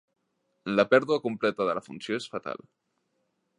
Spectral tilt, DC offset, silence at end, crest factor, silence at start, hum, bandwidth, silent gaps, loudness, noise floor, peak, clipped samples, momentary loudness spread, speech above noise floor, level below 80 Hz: -5.5 dB/octave; under 0.1%; 1 s; 24 dB; 0.65 s; none; 10.5 kHz; none; -27 LUFS; -76 dBFS; -6 dBFS; under 0.1%; 16 LU; 49 dB; -74 dBFS